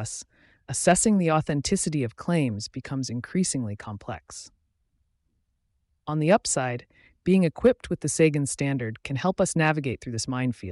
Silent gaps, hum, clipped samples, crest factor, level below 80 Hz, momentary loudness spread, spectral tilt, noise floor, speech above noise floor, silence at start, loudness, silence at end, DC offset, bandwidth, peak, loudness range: none; none; under 0.1%; 18 dB; -54 dBFS; 15 LU; -5 dB/octave; -73 dBFS; 48 dB; 0 s; -25 LUFS; 0 s; under 0.1%; 11.5 kHz; -8 dBFS; 8 LU